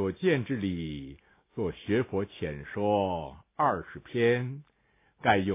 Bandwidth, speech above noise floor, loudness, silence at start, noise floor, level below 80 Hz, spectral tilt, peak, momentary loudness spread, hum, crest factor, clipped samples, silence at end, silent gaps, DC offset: 3.8 kHz; 39 dB; -30 LUFS; 0 s; -68 dBFS; -54 dBFS; -5 dB/octave; -8 dBFS; 13 LU; none; 22 dB; under 0.1%; 0 s; none; under 0.1%